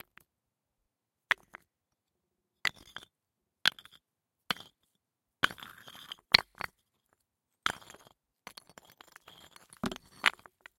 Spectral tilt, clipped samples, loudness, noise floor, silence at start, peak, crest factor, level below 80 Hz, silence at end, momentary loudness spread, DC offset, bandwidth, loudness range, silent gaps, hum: -1.5 dB/octave; under 0.1%; -32 LUFS; -86 dBFS; 1.3 s; 0 dBFS; 38 dB; -68 dBFS; 0.5 s; 28 LU; under 0.1%; 16.5 kHz; 10 LU; none; none